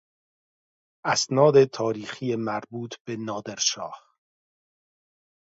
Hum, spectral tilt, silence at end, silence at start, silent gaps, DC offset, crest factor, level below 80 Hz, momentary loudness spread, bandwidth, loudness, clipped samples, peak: none; -4 dB/octave; 1.45 s; 1.05 s; 3.00-3.05 s; under 0.1%; 22 dB; -72 dBFS; 16 LU; 8 kHz; -24 LUFS; under 0.1%; -4 dBFS